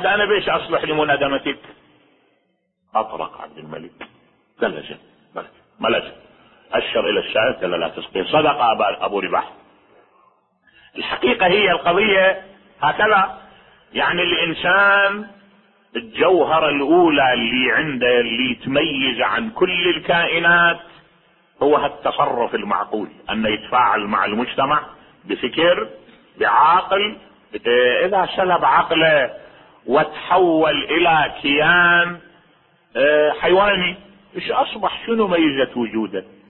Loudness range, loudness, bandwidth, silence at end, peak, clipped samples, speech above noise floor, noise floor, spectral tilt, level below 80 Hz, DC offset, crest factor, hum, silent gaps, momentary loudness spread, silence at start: 8 LU; -17 LUFS; 4.3 kHz; 0.25 s; -2 dBFS; under 0.1%; 50 dB; -68 dBFS; -9 dB/octave; -52 dBFS; under 0.1%; 16 dB; none; none; 14 LU; 0 s